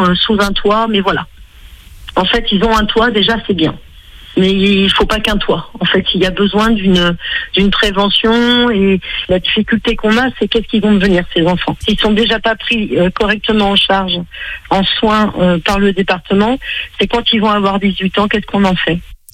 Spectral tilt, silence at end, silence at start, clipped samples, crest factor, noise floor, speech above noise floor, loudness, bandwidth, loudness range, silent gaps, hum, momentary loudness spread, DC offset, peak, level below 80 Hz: -5.5 dB/octave; 0.2 s; 0 s; under 0.1%; 12 dB; -36 dBFS; 24 dB; -12 LUFS; 15 kHz; 2 LU; none; none; 6 LU; under 0.1%; 0 dBFS; -30 dBFS